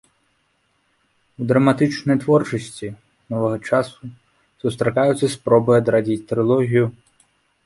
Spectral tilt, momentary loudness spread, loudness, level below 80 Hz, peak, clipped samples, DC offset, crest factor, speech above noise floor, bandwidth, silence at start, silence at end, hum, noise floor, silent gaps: -7 dB/octave; 14 LU; -19 LUFS; -56 dBFS; -2 dBFS; under 0.1%; under 0.1%; 18 dB; 47 dB; 11.5 kHz; 1.4 s; 0.75 s; none; -66 dBFS; none